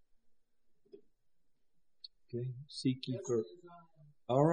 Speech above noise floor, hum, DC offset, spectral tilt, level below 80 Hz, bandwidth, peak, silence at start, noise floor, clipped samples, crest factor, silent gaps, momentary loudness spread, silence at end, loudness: 40 dB; none; under 0.1%; -7 dB/octave; -78 dBFS; 9.6 kHz; -16 dBFS; 0.95 s; -77 dBFS; under 0.1%; 24 dB; none; 21 LU; 0 s; -38 LUFS